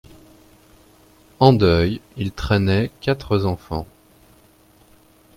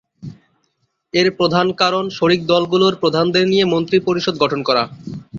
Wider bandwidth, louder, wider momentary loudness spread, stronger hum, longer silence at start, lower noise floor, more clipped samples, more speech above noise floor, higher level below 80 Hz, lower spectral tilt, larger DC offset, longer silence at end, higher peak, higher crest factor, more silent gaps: first, 16 kHz vs 7.4 kHz; second, -20 LUFS vs -16 LUFS; first, 14 LU vs 9 LU; neither; first, 1.4 s vs 0.2 s; second, -53 dBFS vs -67 dBFS; neither; second, 35 dB vs 51 dB; first, -42 dBFS vs -56 dBFS; first, -7.5 dB/octave vs -5.5 dB/octave; neither; first, 1.5 s vs 0 s; about the same, 0 dBFS vs 0 dBFS; about the same, 20 dB vs 16 dB; neither